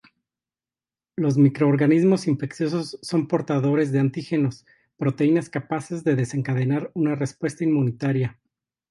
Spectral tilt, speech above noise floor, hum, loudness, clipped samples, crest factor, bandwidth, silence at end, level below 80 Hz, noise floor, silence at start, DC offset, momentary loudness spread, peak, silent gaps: -7.5 dB/octave; over 68 dB; none; -23 LUFS; under 0.1%; 16 dB; 11.5 kHz; 0.6 s; -64 dBFS; under -90 dBFS; 1.2 s; under 0.1%; 9 LU; -6 dBFS; none